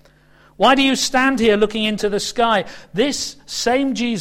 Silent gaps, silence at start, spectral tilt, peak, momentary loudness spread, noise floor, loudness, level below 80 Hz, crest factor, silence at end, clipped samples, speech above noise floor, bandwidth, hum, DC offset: none; 0.6 s; -3 dB/octave; -2 dBFS; 7 LU; -51 dBFS; -17 LUFS; -46 dBFS; 16 dB; 0 s; under 0.1%; 33 dB; 16 kHz; none; under 0.1%